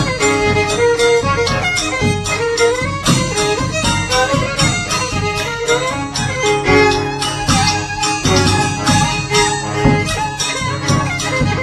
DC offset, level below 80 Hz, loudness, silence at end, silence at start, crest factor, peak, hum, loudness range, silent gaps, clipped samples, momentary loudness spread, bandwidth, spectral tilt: under 0.1%; -32 dBFS; -15 LUFS; 0 s; 0 s; 16 dB; 0 dBFS; none; 1 LU; none; under 0.1%; 5 LU; 14 kHz; -4 dB/octave